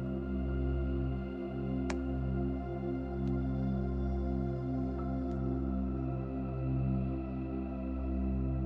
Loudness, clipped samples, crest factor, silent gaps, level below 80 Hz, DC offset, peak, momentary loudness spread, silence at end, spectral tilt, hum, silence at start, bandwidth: -36 LUFS; under 0.1%; 14 dB; none; -40 dBFS; under 0.1%; -20 dBFS; 4 LU; 0 s; -9.5 dB/octave; none; 0 s; 7.4 kHz